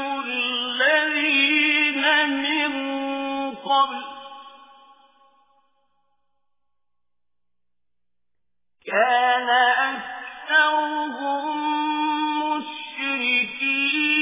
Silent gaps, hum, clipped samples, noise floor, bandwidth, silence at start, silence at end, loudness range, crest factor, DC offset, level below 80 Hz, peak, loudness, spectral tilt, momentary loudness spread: none; none; under 0.1%; -87 dBFS; 3.9 kHz; 0 s; 0 s; 9 LU; 18 dB; under 0.1%; -70 dBFS; -6 dBFS; -21 LUFS; -5.5 dB/octave; 11 LU